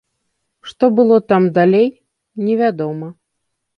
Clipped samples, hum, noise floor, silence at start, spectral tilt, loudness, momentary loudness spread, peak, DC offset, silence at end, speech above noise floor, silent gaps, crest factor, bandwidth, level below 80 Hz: under 0.1%; none; -73 dBFS; 0.65 s; -8.5 dB/octave; -15 LUFS; 19 LU; -2 dBFS; under 0.1%; 0.65 s; 60 dB; none; 16 dB; 6.4 kHz; -62 dBFS